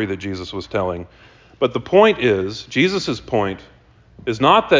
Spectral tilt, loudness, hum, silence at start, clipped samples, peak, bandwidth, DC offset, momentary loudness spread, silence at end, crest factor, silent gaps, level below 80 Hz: -5.5 dB/octave; -19 LUFS; none; 0 s; under 0.1%; -2 dBFS; 7.6 kHz; under 0.1%; 13 LU; 0 s; 18 dB; none; -46 dBFS